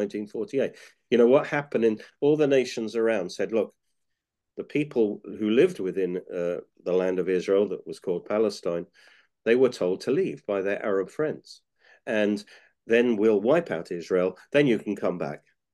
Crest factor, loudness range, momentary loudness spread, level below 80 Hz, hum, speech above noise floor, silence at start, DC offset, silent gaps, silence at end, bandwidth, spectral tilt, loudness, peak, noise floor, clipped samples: 18 dB; 3 LU; 10 LU; -74 dBFS; none; 57 dB; 0 s; under 0.1%; none; 0.35 s; 12 kHz; -6 dB/octave; -26 LUFS; -8 dBFS; -82 dBFS; under 0.1%